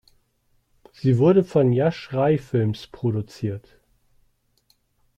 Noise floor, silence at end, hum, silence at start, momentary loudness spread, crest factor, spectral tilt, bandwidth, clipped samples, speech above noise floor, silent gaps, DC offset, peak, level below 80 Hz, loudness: -66 dBFS; 1.6 s; none; 1.05 s; 13 LU; 18 dB; -9 dB/octave; 9 kHz; under 0.1%; 46 dB; none; under 0.1%; -6 dBFS; -58 dBFS; -22 LUFS